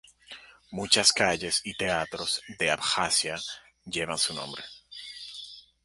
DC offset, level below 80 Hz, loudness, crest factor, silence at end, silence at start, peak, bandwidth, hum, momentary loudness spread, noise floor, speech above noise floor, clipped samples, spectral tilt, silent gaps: under 0.1%; -60 dBFS; -26 LUFS; 24 dB; 0.25 s; 0.3 s; -6 dBFS; 12 kHz; none; 22 LU; -50 dBFS; 21 dB; under 0.1%; -1 dB/octave; none